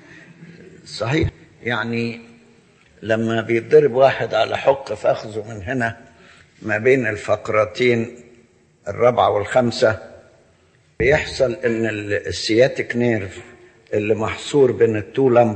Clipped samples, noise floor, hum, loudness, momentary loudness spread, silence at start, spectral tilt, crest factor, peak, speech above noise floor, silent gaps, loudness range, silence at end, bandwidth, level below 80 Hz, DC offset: under 0.1%; -56 dBFS; none; -19 LUFS; 14 LU; 0.1 s; -6 dB/octave; 18 dB; -2 dBFS; 38 dB; none; 3 LU; 0 s; 8.8 kHz; -46 dBFS; under 0.1%